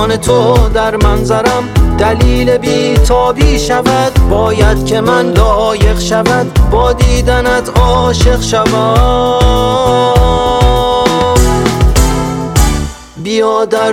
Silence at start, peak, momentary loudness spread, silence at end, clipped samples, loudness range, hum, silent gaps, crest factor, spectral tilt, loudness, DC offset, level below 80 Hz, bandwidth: 0 s; 0 dBFS; 2 LU; 0 s; 2%; 1 LU; none; none; 8 dB; -5.5 dB/octave; -10 LUFS; under 0.1%; -14 dBFS; 16.5 kHz